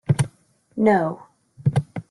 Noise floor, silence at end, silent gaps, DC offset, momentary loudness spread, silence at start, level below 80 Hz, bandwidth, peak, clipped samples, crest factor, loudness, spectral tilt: -56 dBFS; 0.1 s; none; under 0.1%; 14 LU; 0.1 s; -52 dBFS; 12 kHz; -4 dBFS; under 0.1%; 18 dB; -22 LUFS; -7.5 dB/octave